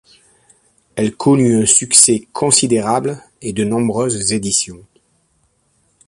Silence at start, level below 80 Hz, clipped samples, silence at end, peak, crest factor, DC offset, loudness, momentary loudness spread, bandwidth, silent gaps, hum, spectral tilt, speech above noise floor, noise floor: 0.95 s; -50 dBFS; under 0.1%; 1.25 s; 0 dBFS; 16 dB; under 0.1%; -14 LUFS; 16 LU; 16 kHz; none; none; -3.5 dB/octave; 46 dB; -61 dBFS